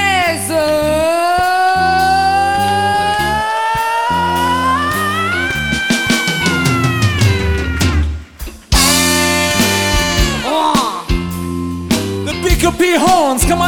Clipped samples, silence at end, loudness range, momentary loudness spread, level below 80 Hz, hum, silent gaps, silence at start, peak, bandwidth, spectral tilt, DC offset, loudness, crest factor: under 0.1%; 0 s; 2 LU; 6 LU; -24 dBFS; none; none; 0 s; 0 dBFS; 19 kHz; -4 dB/octave; 0.5%; -13 LUFS; 14 dB